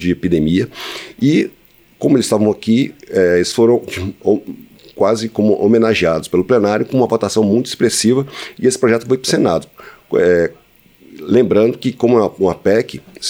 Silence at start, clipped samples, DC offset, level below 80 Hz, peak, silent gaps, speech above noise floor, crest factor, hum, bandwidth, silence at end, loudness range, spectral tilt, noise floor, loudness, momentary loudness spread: 0 s; under 0.1%; under 0.1%; -48 dBFS; 0 dBFS; none; 33 dB; 14 dB; none; over 20 kHz; 0 s; 2 LU; -5.5 dB/octave; -47 dBFS; -15 LUFS; 7 LU